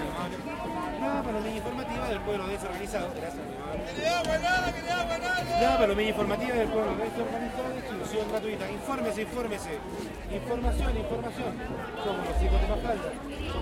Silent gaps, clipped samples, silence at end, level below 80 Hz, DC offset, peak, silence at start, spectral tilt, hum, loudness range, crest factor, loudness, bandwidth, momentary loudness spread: none; under 0.1%; 0 s; -38 dBFS; under 0.1%; -12 dBFS; 0 s; -5 dB/octave; none; 5 LU; 18 dB; -30 LUFS; 16.5 kHz; 10 LU